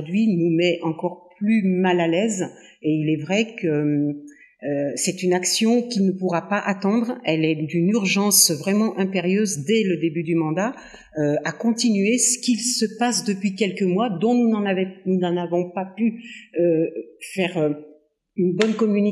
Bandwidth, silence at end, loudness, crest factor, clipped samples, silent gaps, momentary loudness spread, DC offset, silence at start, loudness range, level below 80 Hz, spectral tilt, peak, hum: 15.5 kHz; 0 s; -21 LUFS; 20 dB; under 0.1%; none; 9 LU; under 0.1%; 0 s; 4 LU; -70 dBFS; -4.5 dB/octave; -2 dBFS; none